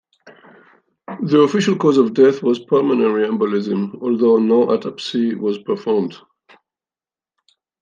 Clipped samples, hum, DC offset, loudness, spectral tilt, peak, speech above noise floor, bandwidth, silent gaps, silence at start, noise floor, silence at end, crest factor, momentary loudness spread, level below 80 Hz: under 0.1%; none; under 0.1%; -17 LUFS; -6.5 dB/octave; -2 dBFS; over 74 dB; 8.8 kHz; none; 0.25 s; under -90 dBFS; 1.65 s; 16 dB; 9 LU; -70 dBFS